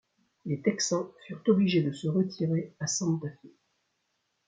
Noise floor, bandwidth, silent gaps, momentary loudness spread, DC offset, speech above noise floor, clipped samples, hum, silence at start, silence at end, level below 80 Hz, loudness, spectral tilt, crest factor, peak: -78 dBFS; 9.4 kHz; none; 11 LU; under 0.1%; 49 dB; under 0.1%; none; 0.45 s; 1 s; -72 dBFS; -29 LUFS; -5 dB/octave; 18 dB; -12 dBFS